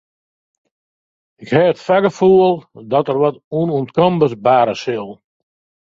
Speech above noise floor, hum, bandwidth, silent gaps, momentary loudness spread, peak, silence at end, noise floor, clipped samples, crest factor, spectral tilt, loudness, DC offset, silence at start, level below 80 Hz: over 75 dB; none; 7.6 kHz; 3.44-3.51 s; 11 LU; 0 dBFS; 0.7 s; under -90 dBFS; under 0.1%; 16 dB; -7.5 dB/octave; -15 LUFS; under 0.1%; 1.4 s; -58 dBFS